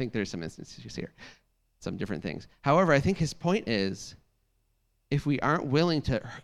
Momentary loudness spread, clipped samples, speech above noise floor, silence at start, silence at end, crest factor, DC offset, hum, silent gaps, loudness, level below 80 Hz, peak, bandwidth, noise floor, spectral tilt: 17 LU; under 0.1%; 44 dB; 0 s; 0.05 s; 20 dB; under 0.1%; none; none; -28 LUFS; -50 dBFS; -10 dBFS; 12.5 kHz; -73 dBFS; -6 dB/octave